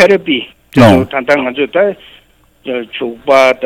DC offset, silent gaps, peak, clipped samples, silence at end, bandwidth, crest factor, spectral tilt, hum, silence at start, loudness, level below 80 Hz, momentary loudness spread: under 0.1%; none; 0 dBFS; under 0.1%; 0 s; 16.5 kHz; 12 dB; -6 dB/octave; none; 0 s; -12 LUFS; -42 dBFS; 14 LU